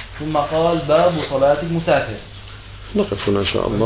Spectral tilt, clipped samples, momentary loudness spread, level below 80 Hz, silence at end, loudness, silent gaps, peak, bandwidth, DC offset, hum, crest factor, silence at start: -10.5 dB/octave; under 0.1%; 19 LU; -38 dBFS; 0 s; -18 LUFS; none; -4 dBFS; 4 kHz; under 0.1%; none; 16 dB; 0 s